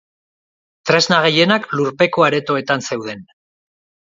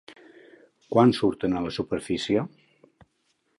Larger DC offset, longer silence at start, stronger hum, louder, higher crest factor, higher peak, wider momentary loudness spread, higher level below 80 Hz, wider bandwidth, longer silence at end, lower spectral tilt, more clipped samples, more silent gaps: neither; about the same, 0.85 s vs 0.9 s; neither; first, -15 LUFS vs -25 LUFS; about the same, 18 dB vs 20 dB; first, 0 dBFS vs -8 dBFS; first, 14 LU vs 9 LU; second, -62 dBFS vs -56 dBFS; second, 7.8 kHz vs 11.5 kHz; second, 0.95 s vs 1.1 s; second, -4 dB/octave vs -6.5 dB/octave; neither; neither